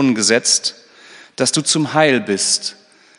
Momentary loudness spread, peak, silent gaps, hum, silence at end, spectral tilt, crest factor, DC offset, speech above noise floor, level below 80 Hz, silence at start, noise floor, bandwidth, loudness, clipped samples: 9 LU; 0 dBFS; none; none; 0.45 s; -2.5 dB/octave; 18 dB; under 0.1%; 27 dB; -70 dBFS; 0 s; -43 dBFS; 11 kHz; -15 LUFS; under 0.1%